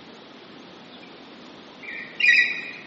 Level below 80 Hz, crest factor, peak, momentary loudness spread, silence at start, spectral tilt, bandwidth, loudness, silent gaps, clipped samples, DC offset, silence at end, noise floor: -78 dBFS; 20 dB; -6 dBFS; 28 LU; 0 s; 1.5 dB/octave; 8 kHz; -18 LUFS; none; under 0.1%; under 0.1%; 0 s; -45 dBFS